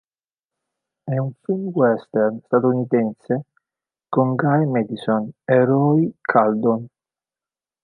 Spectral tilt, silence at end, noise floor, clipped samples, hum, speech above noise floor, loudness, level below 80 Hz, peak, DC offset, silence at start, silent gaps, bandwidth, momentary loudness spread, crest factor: -10.5 dB/octave; 0.95 s; under -90 dBFS; under 0.1%; none; over 71 dB; -20 LUFS; -70 dBFS; -2 dBFS; under 0.1%; 1.05 s; none; 10 kHz; 9 LU; 18 dB